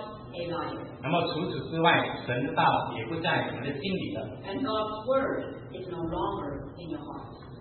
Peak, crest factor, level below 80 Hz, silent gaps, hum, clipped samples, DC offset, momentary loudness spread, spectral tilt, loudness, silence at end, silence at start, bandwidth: -8 dBFS; 22 dB; -56 dBFS; none; none; under 0.1%; under 0.1%; 14 LU; -10 dB/octave; -30 LUFS; 0 s; 0 s; 4.4 kHz